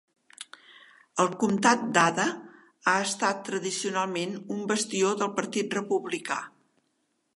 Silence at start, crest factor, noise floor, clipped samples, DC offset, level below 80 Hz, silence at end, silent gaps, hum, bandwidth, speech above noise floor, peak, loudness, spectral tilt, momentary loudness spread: 0.4 s; 24 dB; -75 dBFS; under 0.1%; under 0.1%; -78 dBFS; 0.9 s; none; none; 11.5 kHz; 48 dB; -4 dBFS; -27 LUFS; -3.5 dB/octave; 13 LU